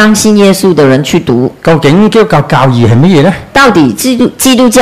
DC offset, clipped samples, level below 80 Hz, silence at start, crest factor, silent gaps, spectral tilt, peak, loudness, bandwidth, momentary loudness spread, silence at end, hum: under 0.1%; 7%; -34 dBFS; 0 s; 6 dB; none; -5.5 dB/octave; 0 dBFS; -6 LUFS; 16 kHz; 4 LU; 0 s; none